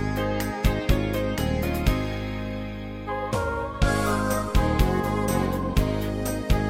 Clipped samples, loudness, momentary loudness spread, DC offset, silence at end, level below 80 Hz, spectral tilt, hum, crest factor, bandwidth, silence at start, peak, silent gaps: under 0.1%; -26 LUFS; 7 LU; under 0.1%; 0 s; -30 dBFS; -6 dB/octave; none; 18 dB; 17 kHz; 0 s; -6 dBFS; none